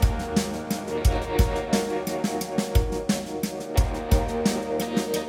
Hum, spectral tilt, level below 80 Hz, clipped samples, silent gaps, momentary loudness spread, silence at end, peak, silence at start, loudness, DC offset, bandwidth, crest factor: none; -5.5 dB/octave; -28 dBFS; under 0.1%; none; 4 LU; 0 s; -6 dBFS; 0 s; -26 LUFS; under 0.1%; 16.5 kHz; 18 dB